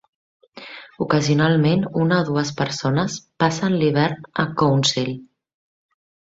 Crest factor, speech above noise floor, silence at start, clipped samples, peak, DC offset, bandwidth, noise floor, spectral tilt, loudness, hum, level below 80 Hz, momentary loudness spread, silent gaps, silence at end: 18 dB; 21 dB; 0.55 s; under 0.1%; -4 dBFS; under 0.1%; 8 kHz; -40 dBFS; -5.5 dB/octave; -20 LUFS; none; -56 dBFS; 13 LU; none; 0.95 s